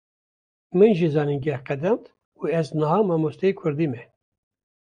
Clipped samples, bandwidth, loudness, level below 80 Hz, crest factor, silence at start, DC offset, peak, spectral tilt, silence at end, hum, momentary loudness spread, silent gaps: under 0.1%; 9.8 kHz; -23 LUFS; -64 dBFS; 18 dB; 0.75 s; under 0.1%; -4 dBFS; -8.5 dB/octave; 0.9 s; none; 9 LU; 2.25-2.32 s